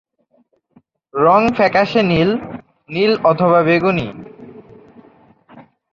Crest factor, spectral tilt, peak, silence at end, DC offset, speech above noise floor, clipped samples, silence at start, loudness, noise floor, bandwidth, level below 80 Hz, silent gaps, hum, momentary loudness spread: 16 dB; -7.5 dB/octave; -2 dBFS; 0.3 s; under 0.1%; 45 dB; under 0.1%; 1.15 s; -15 LUFS; -59 dBFS; 7.2 kHz; -50 dBFS; none; none; 19 LU